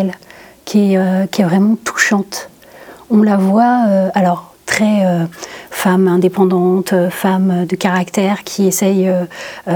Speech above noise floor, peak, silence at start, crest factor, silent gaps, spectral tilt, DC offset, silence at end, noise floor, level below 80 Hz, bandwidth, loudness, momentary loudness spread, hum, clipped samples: 25 dB; 0 dBFS; 0 s; 14 dB; none; -6 dB/octave; under 0.1%; 0 s; -38 dBFS; -58 dBFS; 18.5 kHz; -14 LUFS; 11 LU; none; under 0.1%